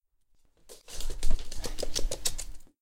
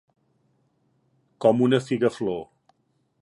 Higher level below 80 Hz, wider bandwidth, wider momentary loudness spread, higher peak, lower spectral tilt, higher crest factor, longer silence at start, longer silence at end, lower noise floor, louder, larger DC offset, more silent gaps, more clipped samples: first, -32 dBFS vs -68 dBFS; first, 15.5 kHz vs 11 kHz; first, 14 LU vs 10 LU; second, -10 dBFS vs -6 dBFS; second, -2.5 dB/octave vs -7 dB/octave; about the same, 18 dB vs 20 dB; second, 0.7 s vs 1.4 s; second, 0.15 s vs 0.8 s; second, -64 dBFS vs -70 dBFS; second, -36 LUFS vs -23 LUFS; neither; neither; neither